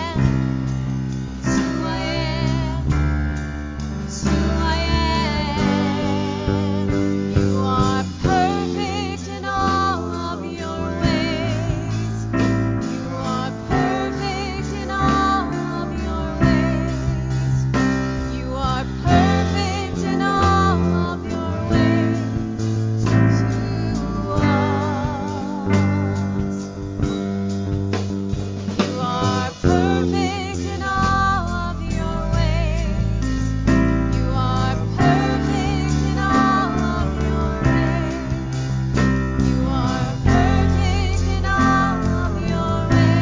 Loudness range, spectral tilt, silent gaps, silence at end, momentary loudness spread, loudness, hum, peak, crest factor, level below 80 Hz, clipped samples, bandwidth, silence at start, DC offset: 3 LU; -6.5 dB/octave; none; 0 s; 8 LU; -21 LUFS; none; -2 dBFS; 18 dB; -28 dBFS; under 0.1%; 7.6 kHz; 0 s; under 0.1%